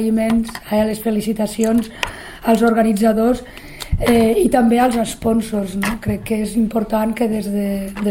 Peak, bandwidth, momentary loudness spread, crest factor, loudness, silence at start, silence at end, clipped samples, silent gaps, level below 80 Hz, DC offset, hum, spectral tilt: 0 dBFS; 16.5 kHz; 9 LU; 16 dB; -18 LUFS; 0 s; 0 s; under 0.1%; none; -34 dBFS; under 0.1%; none; -5.5 dB/octave